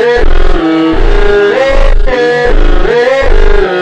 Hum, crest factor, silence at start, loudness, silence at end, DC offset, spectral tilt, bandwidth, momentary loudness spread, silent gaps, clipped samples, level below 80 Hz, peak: none; 6 dB; 0 s; -9 LUFS; 0 s; 10%; -6 dB/octave; 7.2 kHz; 3 LU; none; under 0.1%; -8 dBFS; 0 dBFS